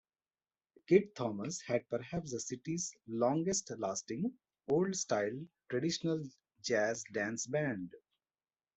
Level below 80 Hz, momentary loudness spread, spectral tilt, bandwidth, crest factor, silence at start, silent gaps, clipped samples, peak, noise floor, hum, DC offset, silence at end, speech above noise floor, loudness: -72 dBFS; 10 LU; -4.5 dB/octave; 8.2 kHz; 22 dB; 0.9 s; none; under 0.1%; -14 dBFS; under -90 dBFS; none; under 0.1%; 0.8 s; over 54 dB; -36 LUFS